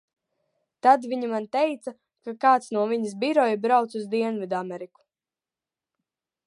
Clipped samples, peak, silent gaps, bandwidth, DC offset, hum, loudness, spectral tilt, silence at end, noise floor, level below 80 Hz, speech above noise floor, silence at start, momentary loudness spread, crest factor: under 0.1%; -4 dBFS; none; 11.5 kHz; under 0.1%; none; -24 LUFS; -5.5 dB/octave; 1.6 s; under -90 dBFS; -82 dBFS; over 66 dB; 0.85 s; 17 LU; 22 dB